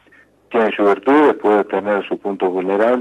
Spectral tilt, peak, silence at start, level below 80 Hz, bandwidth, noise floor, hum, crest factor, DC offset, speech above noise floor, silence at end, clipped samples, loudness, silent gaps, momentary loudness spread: -7 dB/octave; -2 dBFS; 0.5 s; -64 dBFS; 9 kHz; -51 dBFS; none; 14 dB; under 0.1%; 36 dB; 0 s; under 0.1%; -16 LUFS; none; 7 LU